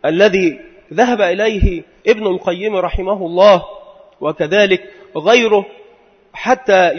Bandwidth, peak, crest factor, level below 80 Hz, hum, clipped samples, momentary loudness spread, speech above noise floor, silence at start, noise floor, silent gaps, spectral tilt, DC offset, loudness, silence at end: 6.6 kHz; 0 dBFS; 14 dB; -30 dBFS; none; under 0.1%; 13 LU; 34 dB; 0.05 s; -48 dBFS; none; -5 dB/octave; under 0.1%; -14 LUFS; 0 s